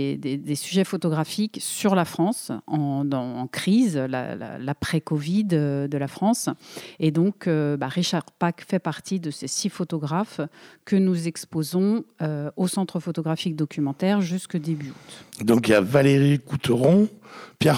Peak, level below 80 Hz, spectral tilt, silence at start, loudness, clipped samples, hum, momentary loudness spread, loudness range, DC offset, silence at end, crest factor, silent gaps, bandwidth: -2 dBFS; -62 dBFS; -6 dB/octave; 0 s; -24 LUFS; under 0.1%; none; 11 LU; 5 LU; under 0.1%; 0 s; 20 dB; none; 17.5 kHz